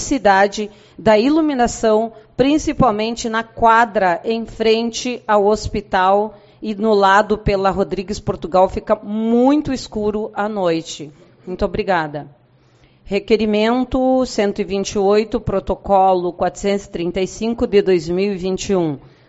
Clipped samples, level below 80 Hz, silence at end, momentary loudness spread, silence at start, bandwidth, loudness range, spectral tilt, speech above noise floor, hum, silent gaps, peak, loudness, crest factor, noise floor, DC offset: under 0.1%; -38 dBFS; 0.3 s; 10 LU; 0 s; 8 kHz; 4 LU; -4 dB/octave; 35 dB; none; none; 0 dBFS; -17 LUFS; 16 dB; -52 dBFS; under 0.1%